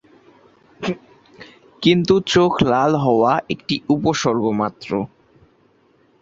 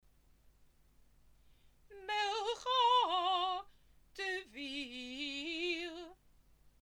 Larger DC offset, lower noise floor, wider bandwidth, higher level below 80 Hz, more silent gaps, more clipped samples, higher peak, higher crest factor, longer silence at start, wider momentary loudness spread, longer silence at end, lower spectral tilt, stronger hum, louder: neither; second, -57 dBFS vs -67 dBFS; second, 7.8 kHz vs 16.5 kHz; first, -50 dBFS vs -70 dBFS; neither; neither; first, -2 dBFS vs -20 dBFS; about the same, 18 dB vs 18 dB; second, 0.8 s vs 1.9 s; second, 12 LU vs 16 LU; first, 1.15 s vs 0.15 s; first, -5.5 dB/octave vs -1.5 dB/octave; neither; first, -18 LUFS vs -36 LUFS